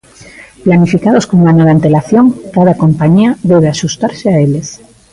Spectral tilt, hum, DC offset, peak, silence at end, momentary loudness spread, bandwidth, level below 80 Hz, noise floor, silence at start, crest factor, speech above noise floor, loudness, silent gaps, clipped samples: -7 dB/octave; none; under 0.1%; 0 dBFS; 0.35 s; 7 LU; 11 kHz; -42 dBFS; -35 dBFS; 0.4 s; 10 dB; 27 dB; -9 LUFS; none; under 0.1%